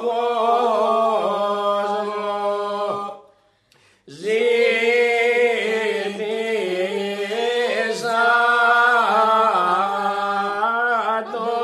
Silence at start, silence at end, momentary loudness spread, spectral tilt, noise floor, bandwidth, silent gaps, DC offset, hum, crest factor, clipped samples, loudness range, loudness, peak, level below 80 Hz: 0 s; 0 s; 9 LU; -3.5 dB/octave; -58 dBFS; 12.5 kHz; none; under 0.1%; none; 16 dB; under 0.1%; 5 LU; -19 LUFS; -4 dBFS; -74 dBFS